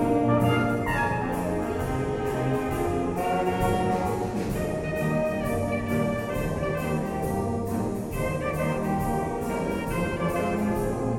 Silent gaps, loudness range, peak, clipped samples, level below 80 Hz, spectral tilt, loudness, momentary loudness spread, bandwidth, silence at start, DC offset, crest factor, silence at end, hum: none; 2 LU; -10 dBFS; under 0.1%; -40 dBFS; -7 dB/octave; -27 LUFS; 4 LU; 16.5 kHz; 0 s; under 0.1%; 16 dB; 0 s; none